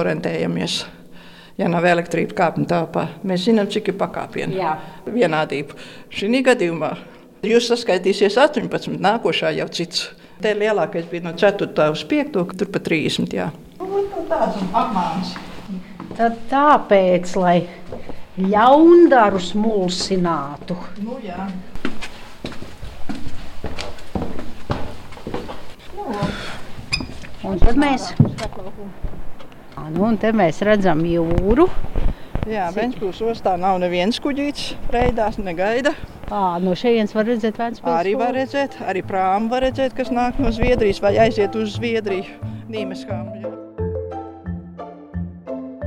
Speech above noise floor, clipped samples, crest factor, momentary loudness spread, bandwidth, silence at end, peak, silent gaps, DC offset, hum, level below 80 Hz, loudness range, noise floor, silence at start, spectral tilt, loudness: 22 dB; under 0.1%; 18 dB; 16 LU; 13 kHz; 0 s; -2 dBFS; none; under 0.1%; none; -32 dBFS; 13 LU; -40 dBFS; 0 s; -6 dB/octave; -19 LUFS